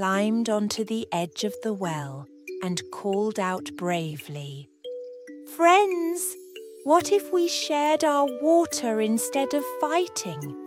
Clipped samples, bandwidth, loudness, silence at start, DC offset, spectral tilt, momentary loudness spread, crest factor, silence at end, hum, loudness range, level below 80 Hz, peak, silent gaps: under 0.1%; 16.5 kHz; -25 LUFS; 0 s; under 0.1%; -4 dB/octave; 18 LU; 20 dB; 0 s; none; 7 LU; -72 dBFS; -6 dBFS; none